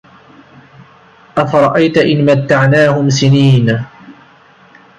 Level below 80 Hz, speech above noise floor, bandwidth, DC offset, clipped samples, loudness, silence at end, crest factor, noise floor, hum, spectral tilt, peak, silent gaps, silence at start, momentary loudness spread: -50 dBFS; 34 dB; 8.2 kHz; under 0.1%; under 0.1%; -11 LUFS; 0.85 s; 12 dB; -44 dBFS; none; -6.5 dB/octave; 0 dBFS; none; 1.35 s; 9 LU